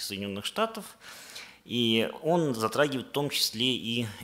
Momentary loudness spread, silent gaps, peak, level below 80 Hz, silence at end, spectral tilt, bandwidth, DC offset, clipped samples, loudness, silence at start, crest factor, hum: 17 LU; none; -10 dBFS; -70 dBFS; 0 s; -4 dB/octave; 16 kHz; under 0.1%; under 0.1%; -28 LUFS; 0 s; 20 dB; none